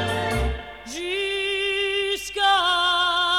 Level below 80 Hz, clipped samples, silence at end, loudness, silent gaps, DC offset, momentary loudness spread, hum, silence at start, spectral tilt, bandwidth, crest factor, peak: -38 dBFS; under 0.1%; 0 s; -22 LUFS; none; 0.1%; 11 LU; none; 0 s; -3 dB/octave; 18.5 kHz; 14 dB; -10 dBFS